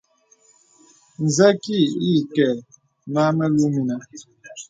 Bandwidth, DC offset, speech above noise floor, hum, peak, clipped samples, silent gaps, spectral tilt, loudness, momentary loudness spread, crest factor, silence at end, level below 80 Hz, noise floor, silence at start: 9.4 kHz; under 0.1%; 39 dB; none; -2 dBFS; under 0.1%; none; -5.5 dB/octave; -20 LUFS; 15 LU; 20 dB; 0.05 s; -64 dBFS; -58 dBFS; 1.2 s